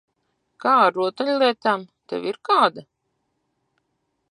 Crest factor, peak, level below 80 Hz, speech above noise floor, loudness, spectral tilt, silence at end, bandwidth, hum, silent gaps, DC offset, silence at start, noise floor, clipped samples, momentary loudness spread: 22 dB; -2 dBFS; -78 dBFS; 53 dB; -20 LUFS; -5 dB/octave; 1.5 s; 11 kHz; none; none; under 0.1%; 0.65 s; -74 dBFS; under 0.1%; 11 LU